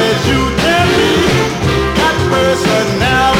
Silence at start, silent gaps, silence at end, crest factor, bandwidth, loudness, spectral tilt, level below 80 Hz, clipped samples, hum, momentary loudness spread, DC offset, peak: 0 s; none; 0 s; 12 dB; 17 kHz; -12 LUFS; -4.5 dB/octave; -26 dBFS; under 0.1%; none; 3 LU; under 0.1%; 0 dBFS